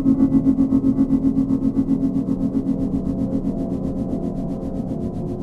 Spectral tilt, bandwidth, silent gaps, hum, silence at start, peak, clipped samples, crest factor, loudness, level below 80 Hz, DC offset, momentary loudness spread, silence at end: -10.5 dB/octave; 2.4 kHz; none; none; 0 s; -6 dBFS; under 0.1%; 14 dB; -21 LUFS; -34 dBFS; under 0.1%; 9 LU; 0 s